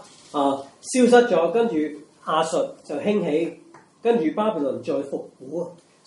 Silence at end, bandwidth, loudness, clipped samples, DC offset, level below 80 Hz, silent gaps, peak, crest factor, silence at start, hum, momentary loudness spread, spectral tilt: 0.35 s; 11.5 kHz; -23 LUFS; under 0.1%; under 0.1%; -74 dBFS; none; -2 dBFS; 20 dB; 0.35 s; none; 15 LU; -5 dB/octave